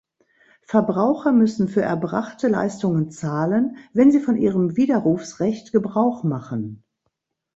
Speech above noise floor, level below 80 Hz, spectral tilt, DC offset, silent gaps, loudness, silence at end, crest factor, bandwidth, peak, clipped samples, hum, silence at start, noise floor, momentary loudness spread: 56 dB; -60 dBFS; -8 dB/octave; under 0.1%; none; -21 LUFS; 0.8 s; 18 dB; 8 kHz; -2 dBFS; under 0.1%; none; 0.7 s; -75 dBFS; 8 LU